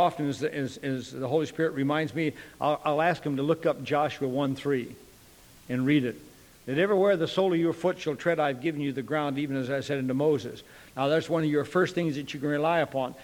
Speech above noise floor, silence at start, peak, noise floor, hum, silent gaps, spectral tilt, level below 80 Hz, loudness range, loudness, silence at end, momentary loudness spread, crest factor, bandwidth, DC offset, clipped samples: 26 dB; 0 s; -12 dBFS; -54 dBFS; none; none; -6.5 dB/octave; -64 dBFS; 2 LU; -28 LUFS; 0 s; 7 LU; 16 dB; 19.5 kHz; under 0.1%; under 0.1%